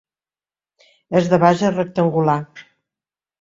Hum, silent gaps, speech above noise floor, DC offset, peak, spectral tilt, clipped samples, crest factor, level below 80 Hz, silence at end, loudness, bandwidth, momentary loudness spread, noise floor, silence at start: none; none; over 73 dB; under 0.1%; 0 dBFS; -7 dB/octave; under 0.1%; 20 dB; -58 dBFS; 0.8 s; -17 LUFS; 7.6 kHz; 8 LU; under -90 dBFS; 1.1 s